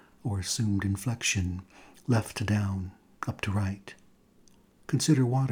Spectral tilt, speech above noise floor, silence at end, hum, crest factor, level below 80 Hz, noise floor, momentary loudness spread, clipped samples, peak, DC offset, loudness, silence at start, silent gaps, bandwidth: -5 dB/octave; 31 dB; 0 s; none; 18 dB; -56 dBFS; -60 dBFS; 17 LU; under 0.1%; -12 dBFS; under 0.1%; -29 LUFS; 0.25 s; none; 19 kHz